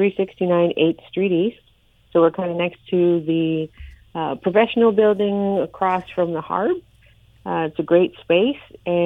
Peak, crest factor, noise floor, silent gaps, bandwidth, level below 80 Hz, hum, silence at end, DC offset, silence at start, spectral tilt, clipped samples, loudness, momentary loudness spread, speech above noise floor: -2 dBFS; 18 dB; -55 dBFS; none; 4 kHz; -52 dBFS; none; 0 s; under 0.1%; 0 s; -9 dB/octave; under 0.1%; -20 LUFS; 9 LU; 36 dB